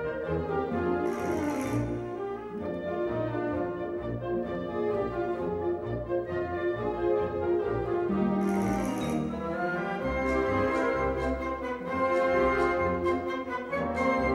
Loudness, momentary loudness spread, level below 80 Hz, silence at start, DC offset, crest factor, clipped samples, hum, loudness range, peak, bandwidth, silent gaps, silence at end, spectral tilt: -30 LUFS; 6 LU; -46 dBFS; 0 s; under 0.1%; 14 dB; under 0.1%; none; 4 LU; -14 dBFS; 13 kHz; none; 0 s; -7 dB/octave